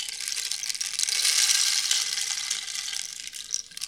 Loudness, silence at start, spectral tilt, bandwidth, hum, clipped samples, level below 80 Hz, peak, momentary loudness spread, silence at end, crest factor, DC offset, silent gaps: -24 LUFS; 0 s; 5 dB/octave; 19.5 kHz; none; under 0.1%; -70 dBFS; -2 dBFS; 12 LU; 0 s; 24 dB; under 0.1%; none